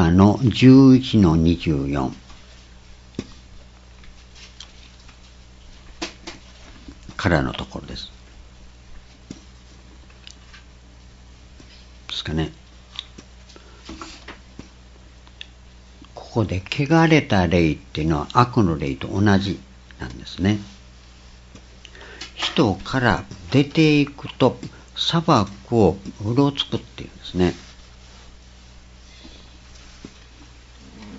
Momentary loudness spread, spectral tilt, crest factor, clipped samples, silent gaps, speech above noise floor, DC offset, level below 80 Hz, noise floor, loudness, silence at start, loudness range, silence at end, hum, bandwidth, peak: 26 LU; -6.5 dB/octave; 22 dB; under 0.1%; none; 27 dB; under 0.1%; -42 dBFS; -45 dBFS; -19 LUFS; 0 s; 20 LU; 0 s; none; 8 kHz; 0 dBFS